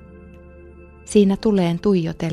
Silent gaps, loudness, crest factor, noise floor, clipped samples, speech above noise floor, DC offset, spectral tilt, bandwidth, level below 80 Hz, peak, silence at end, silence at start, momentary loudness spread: none; -18 LUFS; 16 dB; -43 dBFS; under 0.1%; 25 dB; under 0.1%; -7 dB/octave; 11.5 kHz; -46 dBFS; -4 dBFS; 0 s; 0.15 s; 3 LU